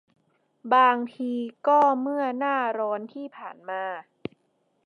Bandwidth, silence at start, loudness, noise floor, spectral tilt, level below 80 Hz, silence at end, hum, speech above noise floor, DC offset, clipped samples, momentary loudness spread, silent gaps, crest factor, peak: 6.8 kHz; 0.65 s; -24 LUFS; -71 dBFS; -6 dB/octave; -78 dBFS; 0.85 s; none; 46 dB; under 0.1%; under 0.1%; 20 LU; none; 18 dB; -8 dBFS